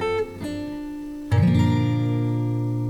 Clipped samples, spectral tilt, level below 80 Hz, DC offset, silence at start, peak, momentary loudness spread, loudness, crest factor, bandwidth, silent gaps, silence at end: under 0.1%; -8.5 dB/octave; -46 dBFS; under 0.1%; 0 s; -8 dBFS; 13 LU; -23 LUFS; 14 dB; 10.5 kHz; none; 0 s